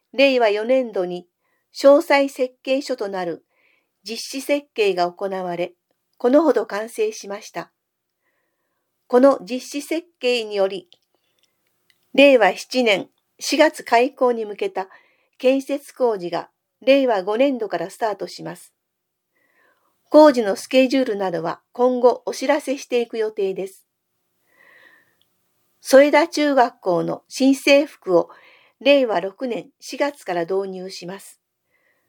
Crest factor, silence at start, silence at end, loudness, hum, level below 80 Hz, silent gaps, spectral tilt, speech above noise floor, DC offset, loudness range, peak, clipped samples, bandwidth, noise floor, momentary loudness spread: 20 dB; 0.15 s; 0.8 s; -19 LUFS; none; -82 dBFS; none; -4 dB/octave; 58 dB; under 0.1%; 6 LU; 0 dBFS; under 0.1%; 19 kHz; -77 dBFS; 16 LU